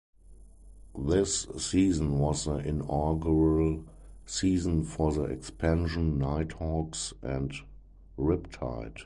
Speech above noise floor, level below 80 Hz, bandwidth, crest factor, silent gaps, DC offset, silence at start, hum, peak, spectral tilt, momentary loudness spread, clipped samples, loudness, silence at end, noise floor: 23 dB; -40 dBFS; 11.5 kHz; 16 dB; none; under 0.1%; 0.3 s; none; -14 dBFS; -6 dB/octave; 11 LU; under 0.1%; -30 LUFS; 0 s; -52 dBFS